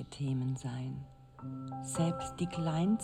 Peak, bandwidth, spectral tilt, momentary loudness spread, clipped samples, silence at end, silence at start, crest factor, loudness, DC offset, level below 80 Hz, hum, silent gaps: -22 dBFS; 14 kHz; -6.5 dB/octave; 13 LU; under 0.1%; 0 s; 0 s; 14 dB; -36 LUFS; under 0.1%; -60 dBFS; none; none